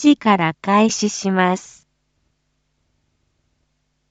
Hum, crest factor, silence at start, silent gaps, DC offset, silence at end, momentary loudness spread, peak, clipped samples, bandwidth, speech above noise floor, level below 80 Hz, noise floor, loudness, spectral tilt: none; 18 dB; 0 s; none; under 0.1%; 2.5 s; 5 LU; -2 dBFS; under 0.1%; 8.2 kHz; 52 dB; -64 dBFS; -69 dBFS; -17 LUFS; -4.5 dB/octave